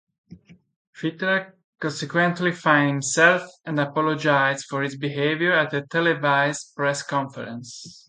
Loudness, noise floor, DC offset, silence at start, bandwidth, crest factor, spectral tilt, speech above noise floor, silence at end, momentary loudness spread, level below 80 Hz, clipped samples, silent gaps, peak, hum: -22 LUFS; -48 dBFS; under 0.1%; 0.3 s; 9.6 kHz; 20 dB; -4.5 dB/octave; 26 dB; 0.15 s; 13 LU; -70 dBFS; under 0.1%; 0.76-0.93 s, 1.64-1.73 s; -4 dBFS; none